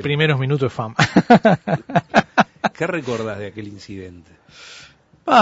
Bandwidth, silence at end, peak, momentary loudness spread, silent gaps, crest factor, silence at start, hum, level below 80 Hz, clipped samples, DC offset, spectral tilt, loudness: 8 kHz; 0 s; 0 dBFS; 22 LU; none; 18 dB; 0 s; none; -54 dBFS; under 0.1%; under 0.1%; -6 dB/octave; -18 LUFS